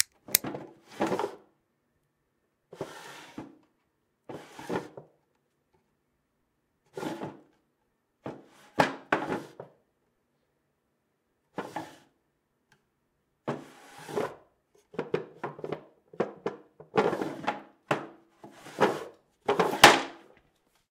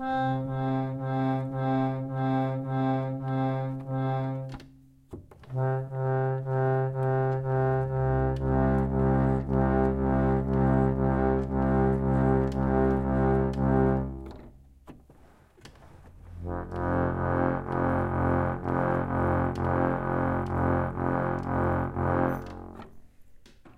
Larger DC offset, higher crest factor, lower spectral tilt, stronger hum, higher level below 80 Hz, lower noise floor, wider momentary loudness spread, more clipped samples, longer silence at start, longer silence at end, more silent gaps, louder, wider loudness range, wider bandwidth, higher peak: neither; first, 34 dB vs 18 dB; second, -3 dB/octave vs -10 dB/octave; neither; second, -66 dBFS vs -40 dBFS; first, -77 dBFS vs -56 dBFS; first, 20 LU vs 8 LU; neither; about the same, 0 s vs 0 s; first, 0.75 s vs 0.05 s; neither; about the same, -29 LUFS vs -27 LUFS; first, 20 LU vs 6 LU; first, 16 kHz vs 4.8 kHz; first, 0 dBFS vs -8 dBFS